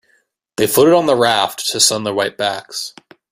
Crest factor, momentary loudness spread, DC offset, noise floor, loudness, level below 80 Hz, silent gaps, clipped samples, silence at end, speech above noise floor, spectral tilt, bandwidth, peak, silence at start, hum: 16 dB; 14 LU; under 0.1%; -61 dBFS; -15 LUFS; -58 dBFS; none; under 0.1%; 0.4 s; 46 dB; -2.5 dB/octave; 16 kHz; 0 dBFS; 0.6 s; none